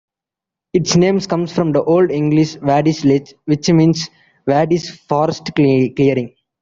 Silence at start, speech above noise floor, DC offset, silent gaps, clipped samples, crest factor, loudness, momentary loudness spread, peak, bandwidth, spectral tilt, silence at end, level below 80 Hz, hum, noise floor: 0.75 s; 71 dB; under 0.1%; none; under 0.1%; 14 dB; -15 LUFS; 7 LU; -2 dBFS; 7.6 kHz; -6 dB/octave; 0.35 s; -52 dBFS; none; -86 dBFS